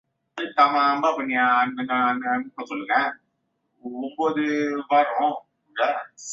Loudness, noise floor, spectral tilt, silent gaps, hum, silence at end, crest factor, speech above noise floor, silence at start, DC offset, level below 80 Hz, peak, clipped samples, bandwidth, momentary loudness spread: -23 LUFS; -74 dBFS; -3.5 dB/octave; none; none; 0 s; 20 dB; 51 dB; 0.35 s; under 0.1%; -74 dBFS; -4 dBFS; under 0.1%; 7.8 kHz; 14 LU